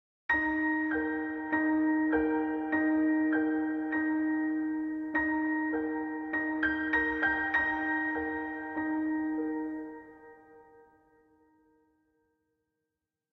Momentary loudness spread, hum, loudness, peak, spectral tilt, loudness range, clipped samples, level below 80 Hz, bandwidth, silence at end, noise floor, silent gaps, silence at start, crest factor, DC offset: 7 LU; none; -30 LUFS; -16 dBFS; -7.5 dB/octave; 8 LU; under 0.1%; -60 dBFS; 4 kHz; 2.7 s; -88 dBFS; none; 0.3 s; 16 dB; under 0.1%